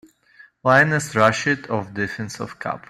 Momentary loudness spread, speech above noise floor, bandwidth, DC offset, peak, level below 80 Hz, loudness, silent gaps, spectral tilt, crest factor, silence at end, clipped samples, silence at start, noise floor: 14 LU; 31 dB; 15 kHz; under 0.1%; -2 dBFS; -58 dBFS; -20 LUFS; none; -5 dB/octave; 20 dB; 0.1 s; under 0.1%; 0.65 s; -52 dBFS